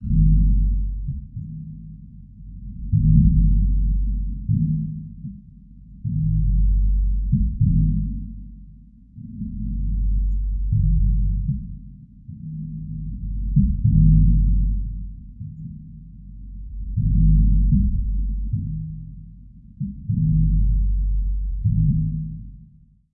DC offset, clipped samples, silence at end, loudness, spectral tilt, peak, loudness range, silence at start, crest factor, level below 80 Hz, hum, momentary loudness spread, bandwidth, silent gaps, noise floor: under 0.1%; under 0.1%; 0.5 s; -22 LUFS; -16 dB/octave; -2 dBFS; 4 LU; 0 s; 18 dB; -22 dBFS; none; 21 LU; 0.3 kHz; none; -51 dBFS